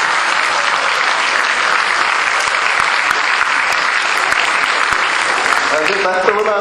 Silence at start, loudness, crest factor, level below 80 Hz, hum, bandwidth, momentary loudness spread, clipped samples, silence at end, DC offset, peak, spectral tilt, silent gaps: 0 s; -13 LUFS; 14 dB; -52 dBFS; none; 16 kHz; 1 LU; under 0.1%; 0 s; under 0.1%; 0 dBFS; -0.5 dB/octave; none